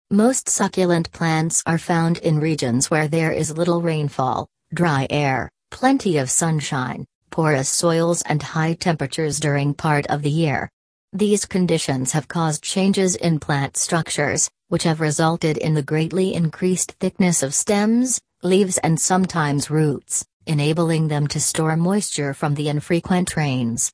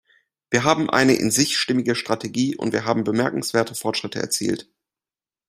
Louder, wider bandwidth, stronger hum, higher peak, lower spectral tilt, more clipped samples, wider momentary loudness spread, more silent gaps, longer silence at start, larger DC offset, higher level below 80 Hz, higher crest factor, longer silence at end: about the same, -20 LUFS vs -21 LUFS; second, 11 kHz vs 16 kHz; neither; about the same, -4 dBFS vs -2 dBFS; about the same, -4.5 dB/octave vs -3.5 dB/octave; neither; second, 5 LU vs 8 LU; first, 7.15-7.21 s, 10.73-11.08 s, 20.33-20.40 s vs none; second, 0.1 s vs 0.5 s; neither; about the same, -54 dBFS vs -58 dBFS; second, 16 dB vs 22 dB; second, 0.05 s vs 0.85 s